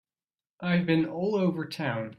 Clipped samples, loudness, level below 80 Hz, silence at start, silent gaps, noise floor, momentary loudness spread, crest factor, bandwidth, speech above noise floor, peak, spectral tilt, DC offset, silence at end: under 0.1%; -28 LUFS; -66 dBFS; 0.6 s; none; under -90 dBFS; 7 LU; 16 dB; 12 kHz; over 63 dB; -12 dBFS; -7.5 dB/octave; under 0.1%; 0.05 s